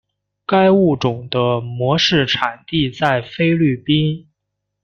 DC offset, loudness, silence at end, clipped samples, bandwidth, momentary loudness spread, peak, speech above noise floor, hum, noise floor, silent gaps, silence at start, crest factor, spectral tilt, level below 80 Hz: under 0.1%; -17 LUFS; 0.65 s; under 0.1%; 7.2 kHz; 7 LU; -2 dBFS; 61 dB; none; -77 dBFS; none; 0.5 s; 16 dB; -6 dB/octave; -50 dBFS